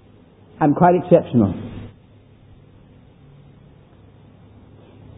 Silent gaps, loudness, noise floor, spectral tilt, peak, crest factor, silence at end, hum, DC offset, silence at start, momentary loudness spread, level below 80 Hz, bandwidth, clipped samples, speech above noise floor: none; -17 LUFS; -49 dBFS; -13 dB/octave; 0 dBFS; 22 dB; 3.3 s; none; under 0.1%; 0.6 s; 22 LU; -48 dBFS; 3.9 kHz; under 0.1%; 34 dB